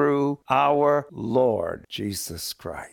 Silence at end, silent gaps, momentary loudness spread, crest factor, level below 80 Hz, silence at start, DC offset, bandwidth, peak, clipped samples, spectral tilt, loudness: 0.05 s; none; 12 LU; 16 dB; -56 dBFS; 0 s; under 0.1%; 19 kHz; -8 dBFS; under 0.1%; -5 dB/octave; -24 LUFS